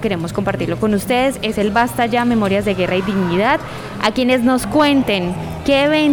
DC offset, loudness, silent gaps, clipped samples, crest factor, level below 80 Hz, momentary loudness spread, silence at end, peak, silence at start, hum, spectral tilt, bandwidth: under 0.1%; -16 LUFS; none; under 0.1%; 14 dB; -40 dBFS; 6 LU; 0 s; -2 dBFS; 0 s; none; -5.5 dB/octave; over 20 kHz